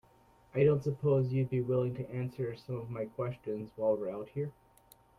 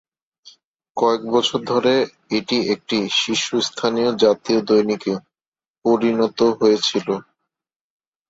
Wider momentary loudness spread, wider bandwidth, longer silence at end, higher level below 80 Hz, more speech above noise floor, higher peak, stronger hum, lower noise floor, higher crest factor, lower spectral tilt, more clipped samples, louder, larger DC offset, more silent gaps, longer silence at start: first, 11 LU vs 8 LU; first, 12 kHz vs 8 kHz; second, 0.65 s vs 1.1 s; about the same, -66 dBFS vs -62 dBFS; second, 31 dB vs over 71 dB; second, -16 dBFS vs -2 dBFS; neither; second, -64 dBFS vs under -90 dBFS; about the same, 18 dB vs 18 dB; first, -9.5 dB/octave vs -4 dB/octave; neither; second, -34 LUFS vs -19 LUFS; neither; second, none vs 5.48-5.52 s, 5.70-5.82 s; second, 0.55 s vs 0.95 s